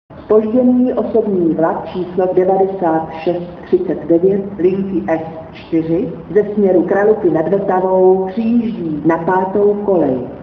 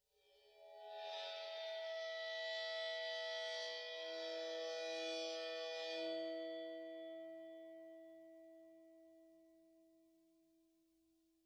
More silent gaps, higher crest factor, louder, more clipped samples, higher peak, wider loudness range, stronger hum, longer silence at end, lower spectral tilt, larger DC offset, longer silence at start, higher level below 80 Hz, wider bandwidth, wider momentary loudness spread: neither; about the same, 14 dB vs 14 dB; first, -15 LUFS vs -46 LUFS; neither; first, 0 dBFS vs -34 dBFS; second, 3 LU vs 17 LU; neither; second, 0 s vs 1.45 s; first, -10.5 dB/octave vs -0.5 dB/octave; neither; second, 0.1 s vs 0.3 s; first, -48 dBFS vs under -90 dBFS; second, 5.4 kHz vs 11 kHz; second, 7 LU vs 18 LU